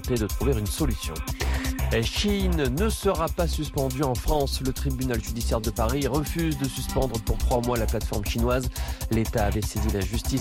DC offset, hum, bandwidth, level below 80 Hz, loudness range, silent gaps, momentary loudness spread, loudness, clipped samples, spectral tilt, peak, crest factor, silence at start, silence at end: under 0.1%; none; 17 kHz; -30 dBFS; 1 LU; none; 4 LU; -26 LUFS; under 0.1%; -5 dB/octave; -12 dBFS; 14 dB; 0 s; 0 s